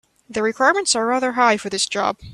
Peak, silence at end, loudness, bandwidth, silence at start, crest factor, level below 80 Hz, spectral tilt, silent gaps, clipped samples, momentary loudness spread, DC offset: -2 dBFS; 0 s; -18 LUFS; 13 kHz; 0.3 s; 18 dB; -56 dBFS; -2 dB/octave; none; under 0.1%; 6 LU; under 0.1%